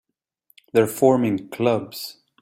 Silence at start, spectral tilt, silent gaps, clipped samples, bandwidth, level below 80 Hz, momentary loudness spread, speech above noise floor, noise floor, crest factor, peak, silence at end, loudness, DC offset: 0.75 s; -6 dB/octave; none; under 0.1%; 16.5 kHz; -62 dBFS; 15 LU; 45 dB; -65 dBFS; 20 dB; -2 dBFS; 0.3 s; -21 LUFS; under 0.1%